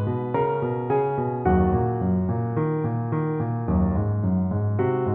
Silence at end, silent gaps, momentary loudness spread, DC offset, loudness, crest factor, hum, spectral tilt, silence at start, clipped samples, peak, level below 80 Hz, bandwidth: 0 s; none; 4 LU; under 0.1%; -24 LUFS; 14 dB; none; -13.5 dB/octave; 0 s; under 0.1%; -8 dBFS; -38 dBFS; 3.6 kHz